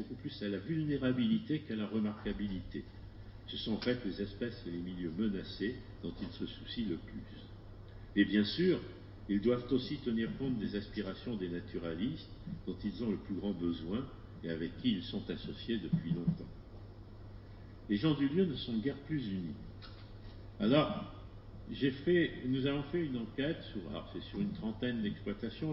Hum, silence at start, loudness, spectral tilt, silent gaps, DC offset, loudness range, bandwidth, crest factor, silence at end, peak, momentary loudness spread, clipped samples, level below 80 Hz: none; 0 s; -37 LUFS; -5.5 dB/octave; none; under 0.1%; 5 LU; 5.8 kHz; 20 dB; 0 s; -16 dBFS; 20 LU; under 0.1%; -54 dBFS